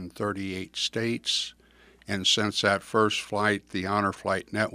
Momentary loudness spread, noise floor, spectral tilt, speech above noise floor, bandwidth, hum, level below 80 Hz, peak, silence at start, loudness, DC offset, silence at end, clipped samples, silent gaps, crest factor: 9 LU; -57 dBFS; -3.5 dB/octave; 30 dB; 15.5 kHz; 60 Hz at -60 dBFS; -64 dBFS; -6 dBFS; 0 s; -27 LUFS; under 0.1%; 0 s; under 0.1%; none; 22 dB